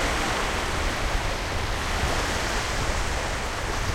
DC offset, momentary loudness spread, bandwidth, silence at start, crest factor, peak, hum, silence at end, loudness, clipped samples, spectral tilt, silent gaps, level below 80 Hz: under 0.1%; 3 LU; 16.5 kHz; 0 s; 14 dB; -12 dBFS; none; 0 s; -27 LUFS; under 0.1%; -3.5 dB/octave; none; -30 dBFS